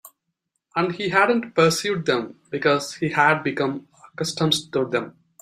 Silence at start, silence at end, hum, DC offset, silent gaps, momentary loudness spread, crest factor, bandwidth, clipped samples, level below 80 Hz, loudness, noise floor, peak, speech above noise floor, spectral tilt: 0.05 s; 0.3 s; none; under 0.1%; none; 10 LU; 20 dB; 15.5 kHz; under 0.1%; -64 dBFS; -22 LUFS; -78 dBFS; -2 dBFS; 56 dB; -4.5 dB/octave